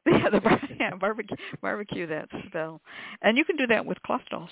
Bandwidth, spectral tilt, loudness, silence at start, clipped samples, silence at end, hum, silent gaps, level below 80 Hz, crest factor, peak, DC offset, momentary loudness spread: 4 kHz; -9.5 dB/octave; -27 LUFS; 0.05 s; under 0.1%; 0 s; none; none; -58 dBFS; 18 dB; -8 dBFS; under 0.1%; 13 LU